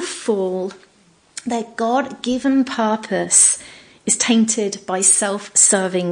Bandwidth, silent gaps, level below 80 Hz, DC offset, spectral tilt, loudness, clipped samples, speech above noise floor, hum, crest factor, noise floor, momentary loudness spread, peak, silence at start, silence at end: 10.5 kHz; none; -62 dBFS; under 0.1%; -2.5 dB/octave; -16 LUFS; under 0.1%; 36 dB; none; 18 dB; -54 dBFS; 13 LU; 0 dBFS; 0 s; 0 s